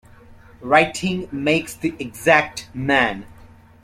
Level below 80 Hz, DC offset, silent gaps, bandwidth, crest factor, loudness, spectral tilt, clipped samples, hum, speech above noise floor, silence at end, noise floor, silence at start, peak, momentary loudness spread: -50 dBFS; under 0.1%; none; 16 kHz; 20 dB; -19 LUFS; -4.5 dB/octave; under 0.1%; none; 26 dB; 0.5 s; -46 dBFS; 0.3 s; 0 dBFS; 11 LU